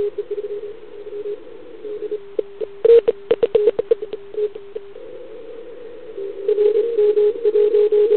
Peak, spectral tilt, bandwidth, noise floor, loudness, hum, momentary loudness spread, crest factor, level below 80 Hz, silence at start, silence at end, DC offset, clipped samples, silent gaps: -4 dBFS; -9.5 dB/octave; 4.3 kHz; -38 dBFS; -19 LUFS; none; 21 LU; 16 dB; -62 dBFS; 0 s; 0 s; 1%; under 0.1%; none